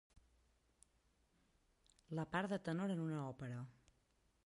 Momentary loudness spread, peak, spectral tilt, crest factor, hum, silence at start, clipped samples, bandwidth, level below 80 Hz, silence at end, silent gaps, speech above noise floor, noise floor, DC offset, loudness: 9 LU; -28 dBFS; -7 dB/octave; 20 dB; none; 2.1 s; under 0.1%; 11.5 kHz; -76 dBFS; 0.75 s; none; 36 dB; -79 dBFS; under 0.1%; -44 LUFS